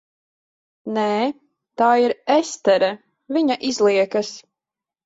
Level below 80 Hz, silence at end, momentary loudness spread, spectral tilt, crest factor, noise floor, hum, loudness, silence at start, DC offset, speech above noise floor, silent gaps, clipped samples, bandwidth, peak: -68 dBFS; 0.65 s; 19 LU; -4 dB/octave; 16 dB; -88 dBFS; none; -20 LUFS; 0.85 s; under 0.1%; 69 dB; none; under 0.1%; 8 kHz; -4 dBFS